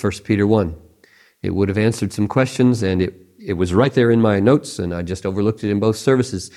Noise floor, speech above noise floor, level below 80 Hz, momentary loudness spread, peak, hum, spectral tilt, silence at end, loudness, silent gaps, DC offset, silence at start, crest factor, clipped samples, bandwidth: -53 dBFS; 36 dB; -50 dBFS; 10 LU; 0 dBFS; none; -6.5 dB/octave; 0.1 s; -18 LUFS; none; under 0.1%; 0 s; 18 dB; under 0.1%; 13 kHz